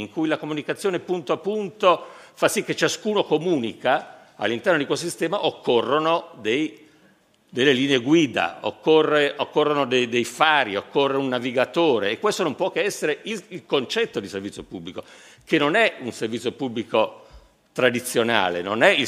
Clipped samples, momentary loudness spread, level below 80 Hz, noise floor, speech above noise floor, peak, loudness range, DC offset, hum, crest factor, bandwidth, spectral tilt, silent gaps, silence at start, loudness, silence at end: under 0.1%; 10 LU; -66 dBFS; -58 dBFS; 36 dB; 0 dBFS; 4 LU; under 0.1%; none; 22 dB; 15.5 kHz; -4 dB/octave; none; 0 s; -22 LUFS; 0 s